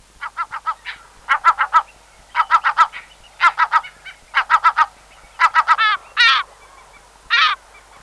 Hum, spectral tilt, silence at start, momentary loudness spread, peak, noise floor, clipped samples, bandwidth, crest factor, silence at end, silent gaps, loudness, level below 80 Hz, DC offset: none; 1 dB/octave; 0.2 s; 17 LU; -2 dBFS; -47 dBFS; under 0.1%; 12 kHz; 16 dB; 0.45 s; none; -16 LUFS; -56 dBFS; under 0.1%